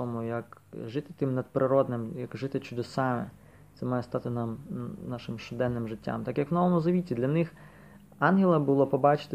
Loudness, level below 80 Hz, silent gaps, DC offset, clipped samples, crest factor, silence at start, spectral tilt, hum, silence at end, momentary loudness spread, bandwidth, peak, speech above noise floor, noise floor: -29 LUFS; -62 dBFS; none; under 0.1%; under 0.1%; 20 dB; 0 s; -8.5 dB/octave; none; 0 s; 14 LU; 13 kHz; -8 dBFS; 24 dB; -52 dBFS